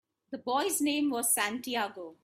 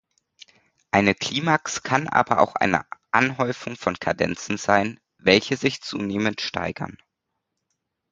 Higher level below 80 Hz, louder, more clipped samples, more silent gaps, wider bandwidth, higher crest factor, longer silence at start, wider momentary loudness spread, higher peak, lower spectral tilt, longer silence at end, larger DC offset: second, -78 dBFS vs -54 dBFS; second, -30 LUFS vs -23 LUFS; neither; neither; first, 16 kHz vs 9.4 kHz; second, 18 dB vs 24 dB; second, 0.3 s vs 0.95 s; about the same, 11 LU vs 9 LU; second, -14 dBFS vs 0 dBFS; second, -1 dB/octave vs -4.5 dB/octave; second, 0.1 s vs 1.15 s; neither